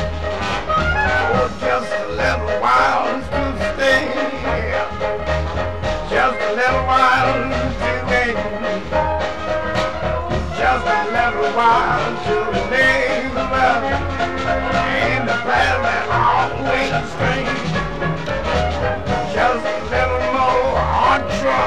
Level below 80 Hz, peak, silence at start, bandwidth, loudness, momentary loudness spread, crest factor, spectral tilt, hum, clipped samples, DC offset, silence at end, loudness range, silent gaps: -32 dBFS; -2 dBFS; 0 s; 12.5 kHz; -18 LUFS; 7 LU; 16 dB; -5.5 dB/octave; none; under 0.1%; 2%; 0 s; 3 LU; none